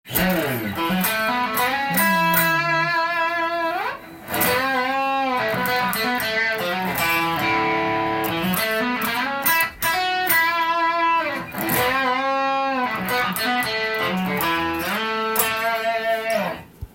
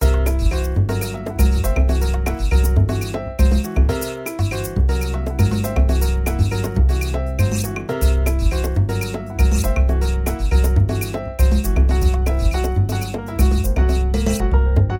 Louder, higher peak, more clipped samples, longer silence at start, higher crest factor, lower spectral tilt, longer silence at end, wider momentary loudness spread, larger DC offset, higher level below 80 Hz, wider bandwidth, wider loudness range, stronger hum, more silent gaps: about the same, -20 LUFS vs -19 LUFS; about the same, -2 dBFS vs -4 dBFS; neither; about the same, 0.05 s vs 0 s; first, 20 dB vs 14 dB; second, -3.5 dB/octave vs -6.5 dB/octave; about the same, 0.05 s vs 0 s; about the same, 5 LU vs 6 LU; neither; second, -52 dBFS vs -18 dBFS; about the same, 17 kHz vs 17 kHz; about the same, 2 LU vs 1 LU; neither; neither